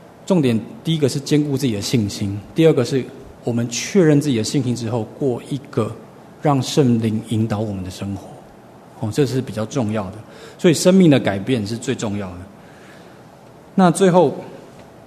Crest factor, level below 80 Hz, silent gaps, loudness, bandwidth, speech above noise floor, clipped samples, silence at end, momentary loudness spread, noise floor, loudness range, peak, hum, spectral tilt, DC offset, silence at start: 20 dB; -56 dBFS; none; -19 LUFS; 13.5 kHz; 25 dB; under 0.1%; 0.25 s; 15 LU; -43 dBFS; 4 LU; 0 dBFS; none; -6 dB/octave; under 0.1%; 0.2 s